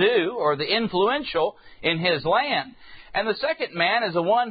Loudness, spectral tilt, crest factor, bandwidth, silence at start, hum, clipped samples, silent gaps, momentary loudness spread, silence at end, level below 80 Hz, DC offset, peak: -23 LUFS; -9.5 dB/octave; 16 dB; 5 kHz; 0 s; none; under 0.1%; none; 6 LU; 0 s; -58 dBFS; under 0.1%; -8 dBFS